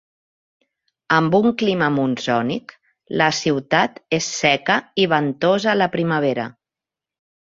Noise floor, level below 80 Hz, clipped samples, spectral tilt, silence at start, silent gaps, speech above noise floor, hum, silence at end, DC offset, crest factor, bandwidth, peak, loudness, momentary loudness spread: -88 dBFS; -60 dBFS; under 0.1%; -4.5 dB/octave; 1.1 s; none; 69 dB; none; 0.95 s; under 0.1%; 20 dB; 7.8 kHz; 0 dBFS; -19 LUFS; 6 LU